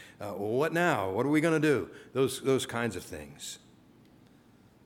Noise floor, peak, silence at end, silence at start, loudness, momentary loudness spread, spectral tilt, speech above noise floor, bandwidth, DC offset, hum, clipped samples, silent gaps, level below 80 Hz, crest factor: -59 dBFS; -12 dBFS; 1.3 s; 0 s; -29 LUFS; 16 LU; -5 dB/octave; 30 dB; 17.5 kHz; under 0.1%; none; under 0.1%; none; -66 dBFS; 20 dB